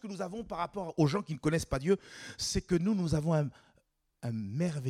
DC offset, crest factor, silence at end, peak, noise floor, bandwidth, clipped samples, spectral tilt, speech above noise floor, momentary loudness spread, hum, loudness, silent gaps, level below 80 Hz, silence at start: under 0.1%; 18 dB; 0 s; -14 dBFS; -73 dBFS; 14.5 kHz; under 0.1%; -6 dB/octave; 41 dB; 9 LU; none; -33 LUFS; none; -52 dBFS; 0.05 s